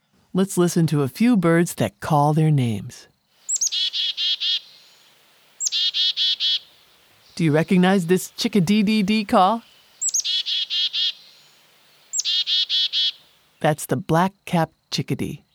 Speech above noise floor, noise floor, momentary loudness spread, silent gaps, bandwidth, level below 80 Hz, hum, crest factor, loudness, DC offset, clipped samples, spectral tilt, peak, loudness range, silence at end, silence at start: 36 dB; -56 dBFS; 8 LU; none; 18 kHz; -60 dBFS; none; 18 dB; -20 LUFS; under 0.1%; under 0.1%; -4 dB/octave; -4 dBFS; 2 LU; 0.15 s; 0.35 s